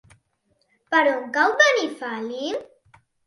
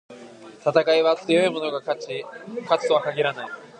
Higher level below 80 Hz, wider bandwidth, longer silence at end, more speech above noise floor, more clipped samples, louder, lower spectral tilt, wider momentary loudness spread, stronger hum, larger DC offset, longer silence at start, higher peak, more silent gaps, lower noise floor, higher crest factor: about the same, -72 dBFS vs -76 dBFS; first, 11.5 kHz vs 9.8 kHz; first, 0.6 s vs 0.15 s; first, 48 dB vs 21 dB; neither; about the same, -21 LUFS vs -22 LUFS; second, -1.5 dB/octave vs -4.5 dB/octave; about the same, 13 LU vs 15 LU; neither; neither; first, 0.9 s vs 0.1 s; about the same, -2 dBFS vs -4 dBFS; neither; first, -69 dBFS vs -43 dBFS; about the same, 22 dB vs 20 dB